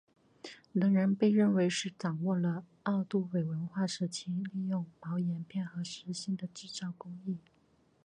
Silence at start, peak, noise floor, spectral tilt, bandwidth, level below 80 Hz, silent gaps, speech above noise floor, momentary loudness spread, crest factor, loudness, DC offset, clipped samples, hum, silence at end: 0.45 s; -16 dBFS; -69 dBFS; -6 dB/octave; 9.8 kHz; -78 dBFS; none; 36 dB; 14 LU; 18 dB; -34 LUFS; under 0.1%; under 0.1%; none; 0.65 s